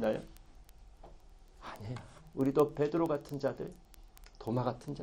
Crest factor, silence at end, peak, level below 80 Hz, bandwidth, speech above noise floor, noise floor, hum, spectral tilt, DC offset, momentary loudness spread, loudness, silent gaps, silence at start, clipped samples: 22 dB; 0 s; -14 dBFS; -58 dBFS; 17 kHz; 22 dB; -56 dBFS; none; -7.5 dB/octave; under 0.1%; 17 LU; -35 LUFS; none; 0 s; under 0.1%